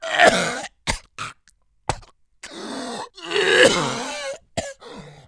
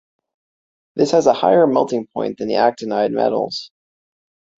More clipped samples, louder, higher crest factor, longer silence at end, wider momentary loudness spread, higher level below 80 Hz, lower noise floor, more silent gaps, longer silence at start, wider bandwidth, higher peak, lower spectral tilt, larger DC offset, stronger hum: neither; second, -21 LUFS vs -17 LUFS; about the same, 22 dB vs 18 dB; second, 0.1 s vs 0.95 s; first, 21 LU vs 11 LU; first, -44 dBFS vs -62 dBFS; second, -61 dBFS vs under -90 dBFS; neither; second, 0 s vs 0.95 s; first, 10.5 kHz vs 8 kHz; about the same, 0 dBFS vs -2 dBFS; second, -2.5 dB/octave vs -5.5 dB/octave; neither; neither